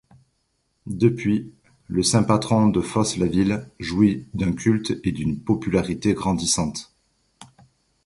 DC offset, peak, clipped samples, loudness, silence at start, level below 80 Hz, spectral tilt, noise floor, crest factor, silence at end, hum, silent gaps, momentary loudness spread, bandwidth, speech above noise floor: under 0.1%; -4 dBFS; under 0.1%; -22 LUFS; 0.85 s; -46 dBFS; -5.5 dB/octave; -71 dBFS; 20 dB; 0.6 s; none; none; 9 LU; 11.5 kHz; 49 dB